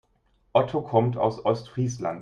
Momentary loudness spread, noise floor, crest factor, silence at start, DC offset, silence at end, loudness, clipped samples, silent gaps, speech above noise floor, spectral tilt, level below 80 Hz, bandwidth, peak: 5 LU; -66 dBFS; 20 dB; 0.55 s; under 0.1%; 0 s; -25 LUFS; under 0.1%; none; 42 dB; -7 dB/octave; -60 dBFS; 9.2 kHz; -6 dBFS